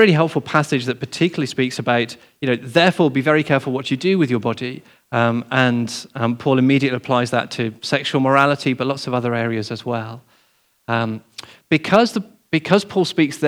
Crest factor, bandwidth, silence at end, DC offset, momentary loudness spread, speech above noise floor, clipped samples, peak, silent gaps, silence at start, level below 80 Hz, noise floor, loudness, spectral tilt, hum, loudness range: 18 dB; 15 kHz; 0 s; under 0.1%; 11 LU; 42 dB; under 0.1%; 0 dBFS; none; 0 s; -66 dBFS; -61 dBFS; -19 LUFS; -6 dB/octave; none; 3 LU